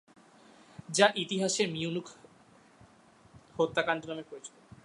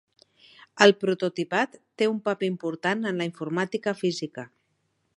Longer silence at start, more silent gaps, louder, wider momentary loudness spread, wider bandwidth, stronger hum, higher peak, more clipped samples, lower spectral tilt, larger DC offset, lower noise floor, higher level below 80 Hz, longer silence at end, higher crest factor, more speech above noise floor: about the same, 0.8 s vs 0.75 s; neither; second, -30 LUFS vs -25 LUFS; first, 23 LU vs 14 LU; about the same, 11.5 kHz vs 11.5 kHz; neither; second, -6 dBFS vs -2 dBFS; neither; second, -3 dB/octave vs -5 dB/octave; neither; second, -60 dBFS vs -73 dBFS; about the same, -72 dBFS vs -76 dBFS; second, 0.35 s vs 0.7 s; about the same, 28 dB vs 26 dB; second, 29 dB vs 48 dB